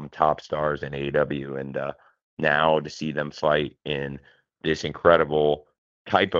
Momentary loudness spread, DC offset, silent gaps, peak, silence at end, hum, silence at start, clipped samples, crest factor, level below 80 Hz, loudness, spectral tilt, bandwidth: 12 LU; under 0.1%; 2.23-2.37 s, 5.78-6.05 s; -2 dBFS; 0 s; none; 0 s; under 0.1%; 24 dB; -52 dBFS; -24 LUFS; -6 dB/octave; 7.6 kHz